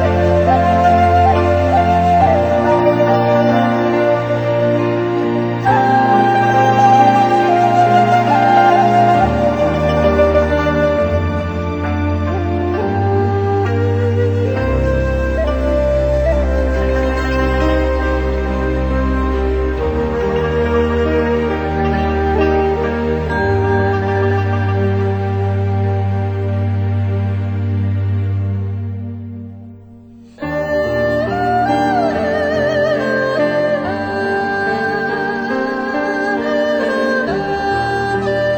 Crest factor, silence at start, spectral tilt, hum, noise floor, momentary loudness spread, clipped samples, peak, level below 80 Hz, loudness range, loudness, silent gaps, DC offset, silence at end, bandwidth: 14 dB; 0 s; -7.5 dB/octave; none; -39 dBFS; 7 LU; under 0.1%; 0 dBFS; -26 dBFS; 6 LU; -15 LUFS; none; under 0.1%; 0 s; 8.6 kHz